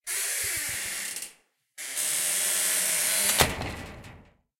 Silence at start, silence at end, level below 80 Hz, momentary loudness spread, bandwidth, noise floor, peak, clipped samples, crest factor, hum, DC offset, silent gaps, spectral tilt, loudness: 0.05 s; 0.35 s; -52 dBFS; 16 LU; 16.5 kHz; -59 dBFS; -2 dBFS; under 0.1%; 26 dB; none; under 0.1%; none; -0.5 dB/octave; -25 LUFS